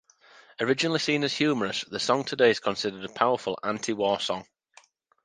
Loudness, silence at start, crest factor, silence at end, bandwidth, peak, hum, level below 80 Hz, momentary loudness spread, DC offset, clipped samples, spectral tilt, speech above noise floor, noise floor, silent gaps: -26 LUFS; 0.6 s; 22 dB; 0.8 s; 10 kHz; -6 dBFS; none; -68 dBFS; 8 LU; under 0.1%; under 0.1%; -4 dB/octave; 33 dB; -59 dBFS; none